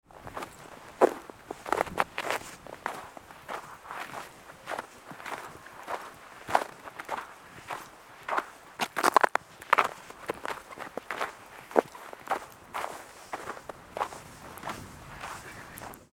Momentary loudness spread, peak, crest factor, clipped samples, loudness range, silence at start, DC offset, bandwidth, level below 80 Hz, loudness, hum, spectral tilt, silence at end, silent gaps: 18 LU; -2 dBFS; 32 dB; under 0.1%; 11 LU; 0.1 s; under 0.1%; 19 kHz; -64 dBFS; -33 LUFS; none; -3 dB/octave; 0.1 s; none